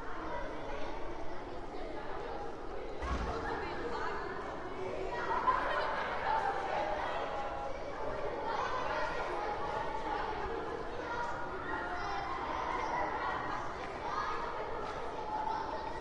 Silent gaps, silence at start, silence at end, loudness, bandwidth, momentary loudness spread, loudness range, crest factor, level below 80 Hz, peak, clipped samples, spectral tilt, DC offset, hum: none; 0 s; 0 s; -38 LUFS; 10.5 kHz; 8 LU; 5 LU; 18 dB; -50 dBFS; -18 dBFS; under 0.1%; -5 dB/octave; under 0.1%; none